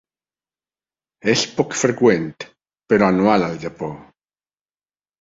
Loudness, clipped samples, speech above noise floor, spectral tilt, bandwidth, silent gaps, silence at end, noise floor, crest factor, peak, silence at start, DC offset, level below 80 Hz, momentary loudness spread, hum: -18 LUFS; under 0.1%; over 72 dB; -4.5 dB/octave; 7.8 kHz; none; 1.2 s; under -90 dBFS; 20 dB; -2 dBFS; 1.25 s; under 0.1%; -56 dBFS; 16 LU; 50 Hz at -55 dBFS